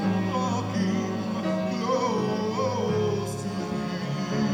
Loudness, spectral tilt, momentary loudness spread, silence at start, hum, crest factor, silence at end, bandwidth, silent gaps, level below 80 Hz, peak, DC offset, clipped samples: -27 LUFS; -6.5 dB/octave; 4 LU; 0 s; none; 12 dB; 0 s; 12.5 kHz; none; -60 dBFS; -14 dBFS; under 0.1%; under 0.1%